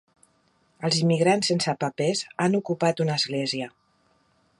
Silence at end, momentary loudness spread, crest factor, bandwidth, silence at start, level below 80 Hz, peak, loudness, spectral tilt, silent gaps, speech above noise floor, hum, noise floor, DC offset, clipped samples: 0.9 s; 8 LU; 18 dB; 11.5 kHz; 0.8 s; -70 dBFS; -8 dBFS; -24 LUFS; -4.5 dB/octave; none; 42 dB; none; -66 dBFS; under 0.1%; under 0.1%